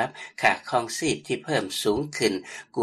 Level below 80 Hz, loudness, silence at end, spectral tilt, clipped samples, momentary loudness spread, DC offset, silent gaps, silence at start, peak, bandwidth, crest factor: -58 dBFS; -26 LUFS; 0 s; -3.5 dB/octave; under 0.1%; 7 LU; under 0.1%; none; 0 s; -6 dBFS; 13.5 kHz; 20 dB